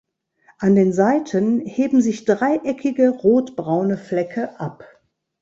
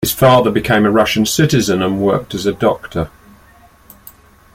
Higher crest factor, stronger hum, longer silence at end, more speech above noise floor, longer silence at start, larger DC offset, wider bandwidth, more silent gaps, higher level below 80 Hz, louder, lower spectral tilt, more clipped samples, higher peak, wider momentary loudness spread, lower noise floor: about the same, 16 dB vs 14 dB; neither; second, 0.55 s vs 1.45 s; first, 39 dB vs 32 dB; first, 0.6 s vs 0 s; neither; second, 7.8 kHz vs 16.5 kHz; neither; second, -60 dBFS vs -42 dBFS; second, -19 LUFS vs -14 LUFS; first, -7.5 dB/octave vs -5 dB/octave; neither; second, -4 dBFS vs 0 dBFS; about the same, 9 LU vs 11 LU; first, -57 dBFS vs -46 dBFS